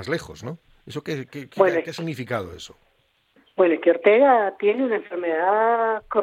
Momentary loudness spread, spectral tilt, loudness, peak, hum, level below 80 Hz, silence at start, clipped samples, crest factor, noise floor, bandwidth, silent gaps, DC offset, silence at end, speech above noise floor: 20 LU; -6 dB/octave; -21 LUFS; -4 dBFS; none; -60 dBFS; 0 s; under 0.1%; 20 dB; -65 dBFS; 14.5 kHz; none; under 0.1%; 0 s; 44 dB